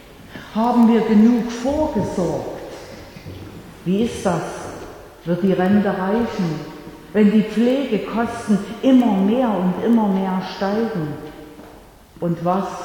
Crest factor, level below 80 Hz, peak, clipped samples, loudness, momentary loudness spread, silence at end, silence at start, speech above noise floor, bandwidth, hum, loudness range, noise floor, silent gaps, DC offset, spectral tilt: 16 dB; -46 dBFS; -4 dBFS; under 0.1%; -19 LUFS; 21 LU; 0 s; 0.05 s; 26 dB; 18 kHz; none; 6 LU; -44 dBFS; none; under 0.1%; -7 dB/octave